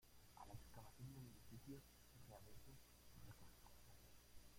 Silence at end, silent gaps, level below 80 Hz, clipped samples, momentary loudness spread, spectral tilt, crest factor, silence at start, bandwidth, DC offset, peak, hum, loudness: 0 s; none; -72 dBFS; under 0.1%; 8 LU; -5 dB/octave; 18 dB; 0 s; 16.5 kHz; under 0.1%; -44 dBFS; 60 Hz at -70 dBFS; -64 LUFS